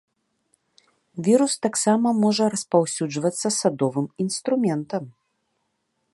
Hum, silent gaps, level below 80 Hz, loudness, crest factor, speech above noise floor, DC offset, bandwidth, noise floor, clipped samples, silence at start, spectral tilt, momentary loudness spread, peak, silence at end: none; none; -72 dBFS; -22 LUFS; 20 dB; 52 dB; under 0.1%; 11.5 kHz; -74 dBFS; under 0.1%; 1.15 s; -4.5 dB/octave; 8 LU; -4 dBFS; 1.05 s